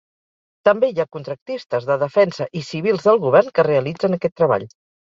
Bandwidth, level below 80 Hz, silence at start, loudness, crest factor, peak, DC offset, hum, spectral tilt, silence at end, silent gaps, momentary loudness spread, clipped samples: 7.6 kHz; -62 dBFS; 0.65 s; -19 LUFS; 18 dB; -2 dBFS; under 0.1%; none; -7 dB/octave; 0.35 s; 1.42-1.46 s; 11 LU; under 0.1%